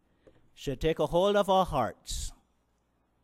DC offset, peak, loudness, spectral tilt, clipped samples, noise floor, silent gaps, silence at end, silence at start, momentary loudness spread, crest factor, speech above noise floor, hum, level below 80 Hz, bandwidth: under 0.1%; -14 dBFS; -29 LUFS; -5 dB/octave; under 0.1%; -73 dBFS; none; 0.9 s; 0.6 s; 13 LU; 18 dB; 45 dB; none; -46 dBFS; 16 kHz